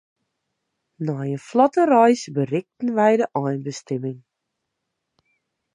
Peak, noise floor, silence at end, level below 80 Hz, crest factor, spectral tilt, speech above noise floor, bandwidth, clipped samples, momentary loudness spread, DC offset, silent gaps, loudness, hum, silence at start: -2 dBFS; -79 dBFS; 1.55 s; -74 dBFS; 20 dB; -6.5 dB/octave; 60 dB; 11 kHz; under 0.1%; 13 LU; under 0.1%; none; -21 LUFS; none; 1 s